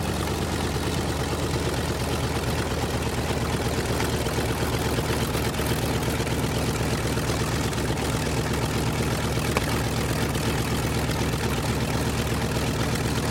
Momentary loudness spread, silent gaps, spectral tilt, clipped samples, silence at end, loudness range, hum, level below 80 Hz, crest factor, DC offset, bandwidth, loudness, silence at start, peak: 1 LU; none; -5 dB/octave; under 0.1%; 0 s; 1 LU; none; -36 dBFS; 18 dB; under 0.1%; 17 kHz; -26 LUFS; 0 s; -8 dBFS